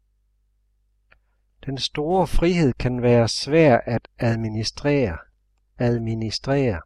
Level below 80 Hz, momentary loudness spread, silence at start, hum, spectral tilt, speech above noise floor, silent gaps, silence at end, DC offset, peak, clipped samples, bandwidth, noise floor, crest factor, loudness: -34 dBFS; 10 LU; 1.65 s; 50 Hz at -45 dBFS; -6 dB/octave; 45 dB; none; 0.05 s; under 0.1%; -4 dBFS; under 0.1%; 12 kHz; -66 dBFS; 18 dB; -21 LUFS